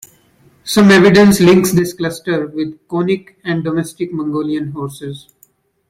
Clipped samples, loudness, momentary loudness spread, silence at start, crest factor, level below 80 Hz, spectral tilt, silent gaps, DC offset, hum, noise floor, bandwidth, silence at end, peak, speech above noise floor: under 0.1%; -13 LUFS; 17 LU; 0.65 s; 14 dB; -48 dBFS; -5.5 dB/octave; none; under 0.1%; none; -54 dBFS; 16 kHz; 0.7 s; 0 dBFS; 40 dB